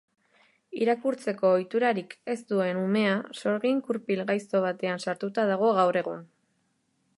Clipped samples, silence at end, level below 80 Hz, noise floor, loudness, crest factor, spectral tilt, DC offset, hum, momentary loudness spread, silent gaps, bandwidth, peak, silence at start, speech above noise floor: under 0.1%; 0.95 s; -80 dBFS; -73 dBFS; -27 LUFS; 18 dB; -6 dB/octave; under 0.1%; none; 7 LU; none; 11.5 kHz; -10 dBFS; 0.7 s; 46 dB